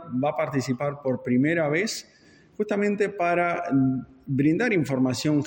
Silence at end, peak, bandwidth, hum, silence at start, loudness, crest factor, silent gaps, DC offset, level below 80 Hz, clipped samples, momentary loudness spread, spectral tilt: 0 s; -10 dBFS; 17 kHz; none; 0 s; -25 LUFS; 14 dB; none; under 0.1%; -62 dBFS; under 0.1%; 7 LU; -6 dB/octave